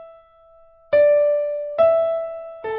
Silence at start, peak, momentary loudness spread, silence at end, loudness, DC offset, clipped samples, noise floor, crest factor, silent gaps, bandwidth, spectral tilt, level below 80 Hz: 0 s; -6 dBFS; 12 LU; 0 s; -18 LUFS; under 0.1%; under 0.1%; -51 dBFS; 14 dB; none; 4.5 kHz; -8.5 dB/octave; -60 dBFS